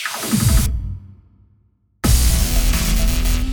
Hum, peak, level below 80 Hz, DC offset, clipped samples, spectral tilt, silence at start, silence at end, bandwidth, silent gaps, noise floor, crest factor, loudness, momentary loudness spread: none; -2 dBFS; -20 dBFS; under 0.1%; under 0.1%; -4 dB/octave; 0 s; 0 s; over 20 kHz; none; -59 dBFS; 14 dB; -18 LUFS; 10 LU